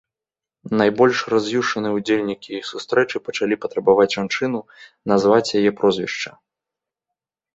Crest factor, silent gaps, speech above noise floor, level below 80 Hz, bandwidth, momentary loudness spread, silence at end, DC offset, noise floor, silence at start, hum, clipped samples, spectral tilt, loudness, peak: 18 dB; none; 70 dB; -60 dBFS; 8 kHz; 12 LU; 1.25 s; under 0.1%; -89 dBFS; 0.65 s; none; under 0.1%; -5 dB/octave; -20 LUFS; -2 dBFS